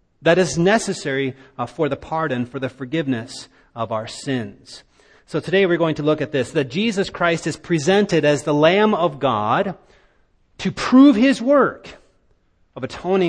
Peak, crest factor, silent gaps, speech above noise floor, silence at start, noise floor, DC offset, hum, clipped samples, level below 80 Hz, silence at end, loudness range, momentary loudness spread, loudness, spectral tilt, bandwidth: 0 dBFS; 18 dB; none; 41 dB; 0.2 s; -60 dBFS; under 0.1%; none; under 0.1%; -54 dBFS; 0 s; 8 LU; 13 LU; -19 LUFS; -5.5 dB/octave; 10 kHz